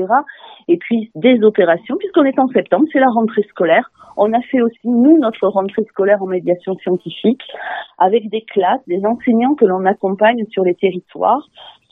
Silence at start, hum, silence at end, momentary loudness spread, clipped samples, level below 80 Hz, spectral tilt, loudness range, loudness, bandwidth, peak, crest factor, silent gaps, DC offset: 0 s; none; 0.2 s; 8 LU; under 0.1%; -66 dBFS; -9 dB/octave; 3 LU; -15 LUFS; 4 kHz; 0 dBFS; 14 dB; none; under 0.1%